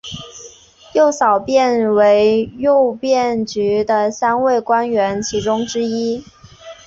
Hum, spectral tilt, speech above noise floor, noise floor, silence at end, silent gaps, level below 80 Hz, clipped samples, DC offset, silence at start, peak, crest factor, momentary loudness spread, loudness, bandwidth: none; -4.5 dB/octave; 27 dB; -42 dBFS; 0.1 s; none; -50 dBFS; under 0.1%; under 0.1%; 0.05 s; -2 dBFS; 14 dB; 8 LU; -16 LUFS; 7.8 kHz